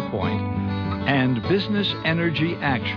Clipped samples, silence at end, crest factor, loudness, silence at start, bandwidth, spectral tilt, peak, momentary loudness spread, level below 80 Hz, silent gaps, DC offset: under 0.1%; 0 s; 14 dB; -23 LUFS; 0 s; 5.4 kHz; -8 dB/octave; -8 dBFS; 5 LU; -48 dBFS; none; under 0.1%